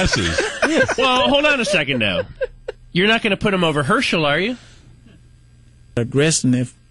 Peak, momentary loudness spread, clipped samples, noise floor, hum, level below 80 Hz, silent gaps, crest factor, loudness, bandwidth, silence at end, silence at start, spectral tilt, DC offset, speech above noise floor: -4 dBFS; 11 LU; under 0.1%; -48 dBFS; none; -40 dBFS; none; 14 dB; -17 LUFS; 11.5 kHz; 0.2 s; 0 s; -4 dB/octave; under 0.1%; 30 dB